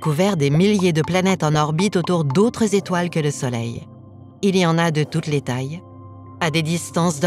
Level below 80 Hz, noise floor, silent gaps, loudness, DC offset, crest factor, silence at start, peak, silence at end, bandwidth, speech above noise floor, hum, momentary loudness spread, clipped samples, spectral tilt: -54 dBFS; -41 dBFS; none; -19 LUFS; under 0.1%; 16 dB; 0 s; -4 dBFS; 0 s; 14.5 kHz; 23 dB; none; 9 LU; under 0.1%; -5.5 dB/octave